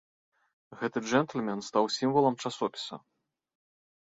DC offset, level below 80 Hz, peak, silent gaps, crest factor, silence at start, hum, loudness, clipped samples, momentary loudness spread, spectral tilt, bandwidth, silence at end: under 0.1%; -74 dBFS; -10 dBFS; none; 22 dB; 0.7 s; none; -30 LUFS; under 0.1%; 12 LU; -5 dB/octave; 8 kHz; 1.05 s